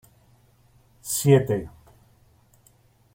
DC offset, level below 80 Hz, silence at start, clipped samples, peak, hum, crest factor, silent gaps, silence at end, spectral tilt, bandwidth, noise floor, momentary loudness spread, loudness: under 0.1%; -56 dBFS; 1.05 s; under 0.1%; -4 dBFS; none; 22 dB; none; 1.45 s; -5.5 dB/octave; 16.5 kHz; -59 dBFS; 22 LU; -22 LUFS